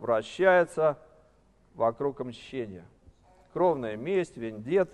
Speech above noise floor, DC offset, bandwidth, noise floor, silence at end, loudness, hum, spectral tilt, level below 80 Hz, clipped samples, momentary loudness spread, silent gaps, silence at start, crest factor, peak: 35 dB; under 0.1%; 11.5 kHz; -63 dBFS; 0.05 s; -28 LUFS; none; -6.5 dB/octave; -64 dBFS; under 0.1%; 17 LU; none; 0 s; 18 dB; -10 dBFS